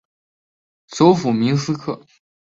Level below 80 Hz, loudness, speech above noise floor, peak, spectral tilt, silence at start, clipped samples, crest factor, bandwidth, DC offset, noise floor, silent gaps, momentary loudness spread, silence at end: -60 dBFS; -17 LUFS; over 73 dB; -2 dBFS; -6.5 dB/octave; 0.9 s; under 0.1%; 18 dB; 7.8 kHz; under 0.1%; under -90 dBFS; none; 17 LU; 0.45 s